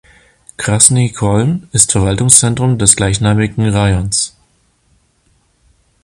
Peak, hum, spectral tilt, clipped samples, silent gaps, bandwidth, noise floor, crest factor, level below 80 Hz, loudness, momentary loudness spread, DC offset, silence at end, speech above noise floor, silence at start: 0 dBFS; none; -4 dB/octave; 0.4%; none; 16 kHz; -56 dBFS; 14 dB; -34 dBFS; -11 LUFS; 8 LU; under 0.1%; 1.75 s; 45 dB; 0.6 s